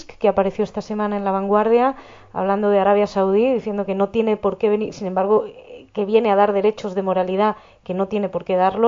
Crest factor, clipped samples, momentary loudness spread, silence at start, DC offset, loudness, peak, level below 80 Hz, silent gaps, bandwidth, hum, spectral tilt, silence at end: 16 dB; under 0.1%; 9 LU; 0 s; under 0.1%; -19 LUFS; -4 dBFS; -54 dBFS; none; 7.4 kHz; none; -7.5 dB/octave; 0 s